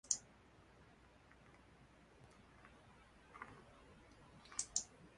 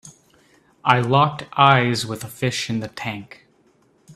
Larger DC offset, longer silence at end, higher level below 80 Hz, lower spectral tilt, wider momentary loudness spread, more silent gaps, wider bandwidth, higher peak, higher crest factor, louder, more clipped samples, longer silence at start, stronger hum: neither; about the same, 0 s vs 0.05 s; second, -72 dBFS vs -58 dBFS; second, -0.5 dB/octave vs -5 dB/octave; first, 24 LU vs 14 LU; neither; second, 11.5 kHz vs 14 kHz; second, -20 dBFS vs 0 dBFS; first, 34 dB vs 22 dB; second, -45 LUFS vs -20 LUFS; neither; about the same, 0.05 s vs 0.05 s; neither